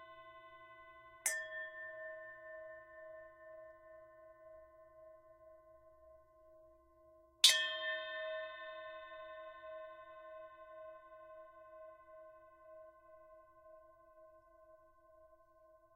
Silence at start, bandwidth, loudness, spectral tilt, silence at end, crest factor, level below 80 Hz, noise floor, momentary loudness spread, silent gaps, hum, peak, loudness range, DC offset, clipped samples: 0 s; 16 kHz; -37 LUFS; 2.5 dB/octave; 0 s; 34 dB; -80 dBFS; -67 dBFS; 23 LU; none; none; -12 dBFS; 24 LU; under 0.1%; under 0.1%